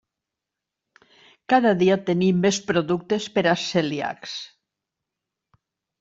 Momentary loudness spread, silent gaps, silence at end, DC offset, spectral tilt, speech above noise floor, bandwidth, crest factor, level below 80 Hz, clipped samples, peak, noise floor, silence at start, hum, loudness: 13 LU; none; 1.55 s; under 0.1%; -5 dB/octave; 64 dB; 7.8 kHz; 18 dB; -64 dBFS; under 0.1%; -6 dBFS; -86 dBFS; 1.5 s; none; -22 LUFS